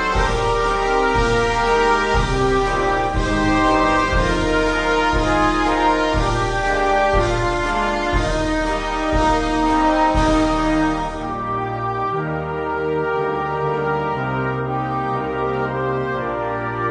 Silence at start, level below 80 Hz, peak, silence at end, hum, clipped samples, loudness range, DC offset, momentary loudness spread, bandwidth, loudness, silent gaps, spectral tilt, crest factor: 0 s; -28 dBFS; -4 dBFS; 0 s; none; under 0.1%; 4 LU; under 0.1%; 6 LU; 10.5 kHz; -19 LUFS; none; -5.5 dB/octave; 14 dB